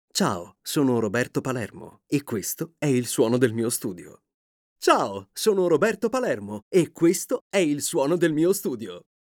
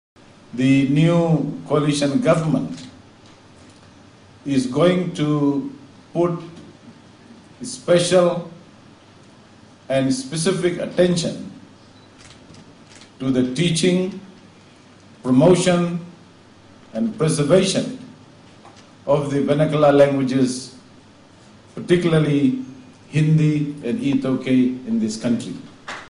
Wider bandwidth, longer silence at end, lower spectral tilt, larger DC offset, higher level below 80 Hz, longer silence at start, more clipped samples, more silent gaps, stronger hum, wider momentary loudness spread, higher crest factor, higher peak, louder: first, 20 kHz vs 11 kHz; first, 0.25 s vs 0 s; second, -4.5 dB/octave vs -6 dB/octave; neither; second, -68 dBFS vs -54 dBFS; second, 0.15 s vs 0.55 s; neither; first, 4.34-4.76 s, 6.62-6.71 s, 7.41-7.50 s vs none; neither; second, 10 LU vs 18 LU; about the same, 18 dB vs 18 dB; about the same, -6 dBFS vs -4 dBFS; second, -24 LUFS vs -19 LUFS